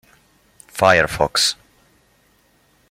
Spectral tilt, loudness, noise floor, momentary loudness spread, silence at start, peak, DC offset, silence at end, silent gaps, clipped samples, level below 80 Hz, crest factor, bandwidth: -2.5 dB/octave; -16 LUFS; -58 dBFS; 18 LU; 0.75 s; -2 dBFS; under 0.1%; 1.35 s; none; under 0.1%; -46 dBFS; 20 dB; 16.5 kHz